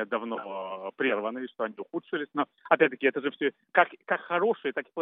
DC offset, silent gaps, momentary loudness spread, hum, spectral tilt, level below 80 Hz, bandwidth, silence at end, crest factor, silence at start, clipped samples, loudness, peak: under 0.1%; none; 11 LU; none; -2 dB/octave; under -90 dBFS; 3.9 kHz; 0 s; 24 dB; 0 s; under 0.1%; -29 LUFS; -4 dBFS